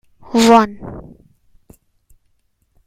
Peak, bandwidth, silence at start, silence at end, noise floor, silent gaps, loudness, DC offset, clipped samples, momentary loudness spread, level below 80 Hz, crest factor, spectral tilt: 0 dBFS; 15.5 kHz; 0.3 s; 1.85 s; -63 dBFS; none; -13 LUFS; under 0.1%; under 0.1%; 23 LU; -48 dBFS; 18 dB; -4.5 dB/octave